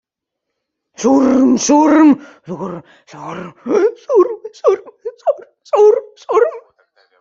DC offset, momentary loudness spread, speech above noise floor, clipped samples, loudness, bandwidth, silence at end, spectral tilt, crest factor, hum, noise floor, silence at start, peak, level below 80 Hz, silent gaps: under 0.1%; 18 LU; 65 dB; under 0.1%; -13 LUFS; 7.6 kHz; 0.6 s; -5 dB/octave; 14 dB; none; -78 dBFS; 1 s; -2 dBFS; -58 dBFS; none